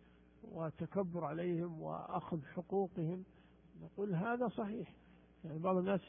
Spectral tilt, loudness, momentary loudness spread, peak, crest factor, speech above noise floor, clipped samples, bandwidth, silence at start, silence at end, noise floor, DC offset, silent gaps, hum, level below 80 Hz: -6 dB/octave; -41 LUFS; 15 LU; -22 dBFS; 18 dB; 20 dB; under 0.1%; 3.6 kHz; 0.4 s; 0 s; -60 dBFS; under 0.1%; none; none; -70 dBFS